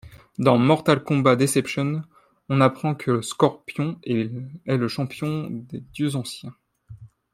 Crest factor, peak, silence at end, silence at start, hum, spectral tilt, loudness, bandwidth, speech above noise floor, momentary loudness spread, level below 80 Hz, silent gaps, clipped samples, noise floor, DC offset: 20 dB; -2 dBFS; 0.25 s; 0.05 s; none; -6 dB/octave; -23 LUFS; 15.5 kHz; 23 dB; 15 LU; -60 dBFS; none; under 0.1%; -45 dBFS; under 0.1%